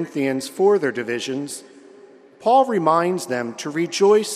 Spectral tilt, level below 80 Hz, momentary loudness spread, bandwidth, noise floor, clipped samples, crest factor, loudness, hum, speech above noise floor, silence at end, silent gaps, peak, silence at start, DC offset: -4.5 dB/octave; -74 dBFS; 10 LU; 14.5 kHz; -47 dBFS; under 0.1%; 16 dB; -20 LUFS; none; 27 dB; 0 s; none; -4 dBFS; 0 s; under 0.1%